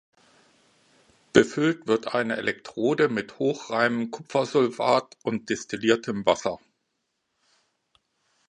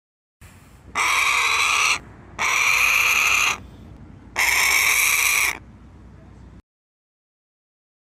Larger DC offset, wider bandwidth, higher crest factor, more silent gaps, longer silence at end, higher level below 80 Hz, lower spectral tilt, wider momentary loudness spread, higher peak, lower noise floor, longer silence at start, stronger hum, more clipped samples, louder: neither; second, 10.5 kHz vs 16 kHz; first, 26 dB vs 18 dB; neither; first, 1.95 s vs 1.45 s; second, -64 dBFS vs -50 dBFS; first, -5 dB/octave vs 1 dB/octave; about the same, 8 LU vs 9 LU; first, 0 dBFS vs -4 dBFS; first, -77 dBFS vs -46 dBFS; first, 1.35 s vs 0.4 s; neither; neither; second, -25 LUFS vs -17 LUFS